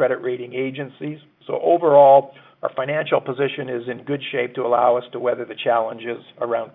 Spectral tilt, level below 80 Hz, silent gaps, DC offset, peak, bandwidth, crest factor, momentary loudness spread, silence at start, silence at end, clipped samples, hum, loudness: -10 dB/octave; -72 dBFS; none; under 0.1%; -2 dBFS; 4 kHz; 18 dB; 17 LU; 0 s; 0.05 s; under 0.1%; none; -20 LUFS